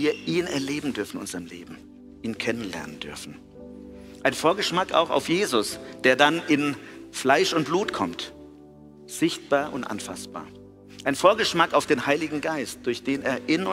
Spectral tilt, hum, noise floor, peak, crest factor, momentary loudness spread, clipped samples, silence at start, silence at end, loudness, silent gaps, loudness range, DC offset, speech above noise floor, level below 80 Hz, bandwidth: -4 dB/octave; none; -47 dBFS; -4 dBFS; 22 dB; 19 LU; under 0.1%; 0 s; 0 s; -24 LUFS; none; 8 LU; under 0.1%; 23 dB; -58 dBFS; 16 kHz